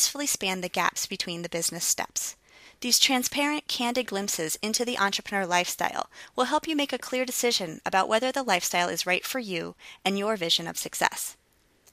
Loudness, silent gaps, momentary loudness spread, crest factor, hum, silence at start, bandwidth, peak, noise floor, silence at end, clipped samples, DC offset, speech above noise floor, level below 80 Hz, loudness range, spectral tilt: -26 LUFS; none; 8 LU; 26 dB; none; 0 s; 15.5 kHz; -2 dBFS; -62 dBFS; 0.6 s; under 0.1%; under 0.1%; 35 dB; -66 dBFS; 2 LU; -1.5 dB/octave